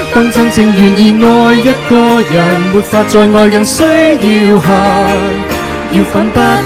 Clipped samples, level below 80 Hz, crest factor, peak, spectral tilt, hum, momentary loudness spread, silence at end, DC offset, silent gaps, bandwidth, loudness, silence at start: 1%; -32 dBFS; 8 dB; 0 dBFS; -5.5 dB/octave; none; 6 LU; 0 s; under 0.1%; none; 16 kHz; -8 LUFS; 0 s